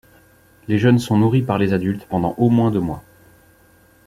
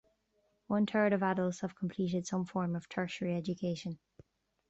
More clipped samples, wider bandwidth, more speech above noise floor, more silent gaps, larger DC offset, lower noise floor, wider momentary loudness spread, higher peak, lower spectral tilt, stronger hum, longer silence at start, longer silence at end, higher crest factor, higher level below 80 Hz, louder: neither; first, 15 kHz vs 8.2 kHz; second, 35 dB vs 43 dB; neither; neither; second, -52 dBFS vs -76 dBFS; about the same, 9 LU vs 9 LU; first, -2 dBFS vs -18 dBFS; first, -8 dB/octave vs -6.5 dB/octave; neither; about the same, 0.7 s vs 0.7 s; first, 1.05 s vs 0.75 s; about the same, 18 dB vs 18 dB; first, -50 dBFS vs -70 dBFS; first, -18 LUFS vs -35 LUFS